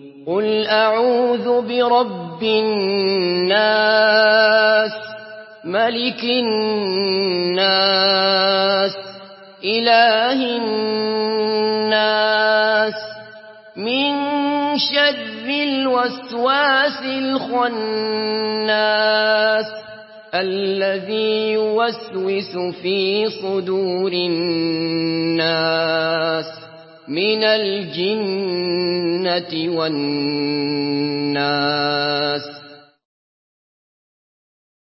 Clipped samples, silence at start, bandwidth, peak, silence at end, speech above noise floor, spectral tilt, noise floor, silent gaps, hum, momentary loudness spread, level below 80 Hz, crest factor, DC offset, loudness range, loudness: under 0.1%; 0 s; 5.8 kHz; -2 dBFS; 2.05 s; 24 dB; -8.5 dB/octave; -42 dBFS; none; none; 9 LU; -70 dBFS; 18 dB; under 0.1%; 5 LU; -18 LUFS